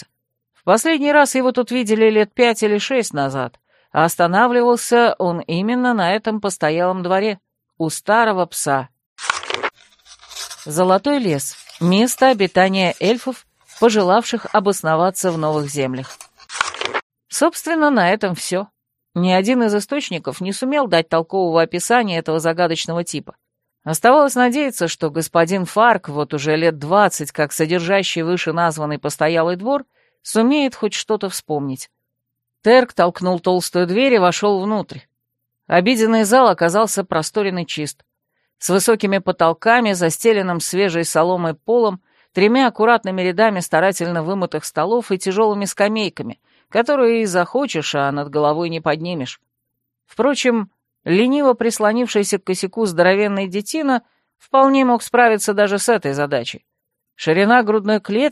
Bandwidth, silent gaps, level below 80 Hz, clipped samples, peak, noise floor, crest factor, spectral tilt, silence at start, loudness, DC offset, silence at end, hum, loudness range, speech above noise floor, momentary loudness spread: 15 kHz; 9.06-9.16 s, 17.03-17.10 s; -64 dBFS; under 0.1%; 0 dBFS; -77 dBFS; 16 dB; -4.5 dB/octave; 0.65 s; -17 LUFS; under 0.1%; 0 s; none; 3 LU; 61 dB; 10 LU